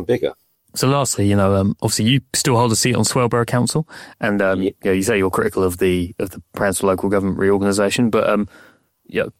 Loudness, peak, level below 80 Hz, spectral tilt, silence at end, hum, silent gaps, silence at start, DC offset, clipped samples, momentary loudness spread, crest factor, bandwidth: -18 LUFS; -6 dBFS; -48 dBFS; -5 dB/octave; 0.1 s; none; none; 0 s; under 0.1%; under 0.1%; 8 LU; 12 dB; 16.5 kHz